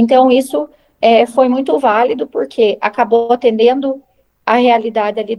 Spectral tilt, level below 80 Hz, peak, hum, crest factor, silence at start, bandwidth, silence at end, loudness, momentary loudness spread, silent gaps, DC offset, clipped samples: -5 dB/octave; -58 dBFS; 0 dBFS; none; 12 dB; 0 s; 12.5 kHz; 0 s; -13 LUFS; 10 LU; none; under 0.1%; under 0.1%